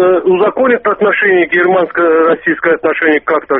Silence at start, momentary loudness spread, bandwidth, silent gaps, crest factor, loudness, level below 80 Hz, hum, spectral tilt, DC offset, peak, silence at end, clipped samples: 0 s; 3 LU; 3.9 kHz; none; 10 dB; -11 LUFS; -52 dBFS; none; -3.5 dB/octave; under 0.1%; 0 dBFS; 0 s; under 0.1%